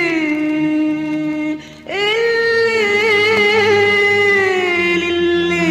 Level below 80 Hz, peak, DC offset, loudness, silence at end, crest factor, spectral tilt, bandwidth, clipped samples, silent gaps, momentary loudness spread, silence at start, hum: -52 dBFS; -2 dBFS; under 0.1%; -14 LUFS; 0 s; 12 dB; -4.5 dB/octave; 14 kHz; under 0.1%; none; 8 LU; 0 s; none